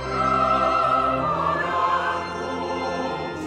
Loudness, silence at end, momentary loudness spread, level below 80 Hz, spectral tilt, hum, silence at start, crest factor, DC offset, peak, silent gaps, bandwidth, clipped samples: -22 LUFS; 0 s; 8 LU; -46 dBFS; -5.5 dB/octave; none; 0 s; 14 dB; under 0.1%; -8 dBFS; none; 11.5 kHz; under 0.1%